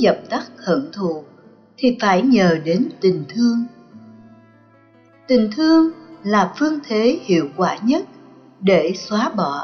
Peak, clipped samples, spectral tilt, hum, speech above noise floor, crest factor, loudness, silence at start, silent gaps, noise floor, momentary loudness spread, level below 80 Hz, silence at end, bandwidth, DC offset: -4 dBFS; under 0.1%; -5 dB/octave; none; 34 dB; 14 dB; -18 LUFS; 0 s; none; -51 dBFS; 10 LU; -60 dBFS; 0 s; 6.6 kHz; under 0.1%